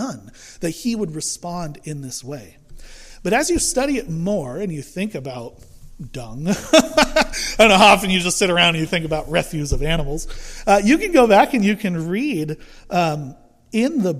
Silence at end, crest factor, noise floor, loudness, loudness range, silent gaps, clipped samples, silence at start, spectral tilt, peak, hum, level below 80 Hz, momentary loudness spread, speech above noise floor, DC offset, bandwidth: 0 s; 18 dB; -38 dBFS; -18 LUFS; 9 LU; none; under 0.1%; 0 s; -4 dB/octave; 0 dBFS; none; -34 dBFS; 18 LU; 19 dB; under 0.1%; 15.5 kHz